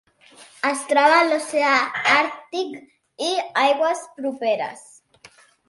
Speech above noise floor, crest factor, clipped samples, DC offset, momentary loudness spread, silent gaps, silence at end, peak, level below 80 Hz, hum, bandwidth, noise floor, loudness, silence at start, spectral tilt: 31 dB; 18 dB; under 0.1%; under 0.1%; 13 LU; none; 0.9 s; -4 dBFS; -76 dBFS; none; 11.5 kHz; -51 dBFS; -20 LUFS; 0.4 s; -2 dB/octave